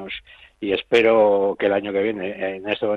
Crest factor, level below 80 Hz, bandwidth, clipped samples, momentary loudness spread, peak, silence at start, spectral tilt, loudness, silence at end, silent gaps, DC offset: 16 dB; -58 dBFS; 8.2 kHz; under 0.1%; 14 LU; -6 dBFS; 0 s; -6 dB/octave; -20 LUFS; 0 s; none; under 0.1%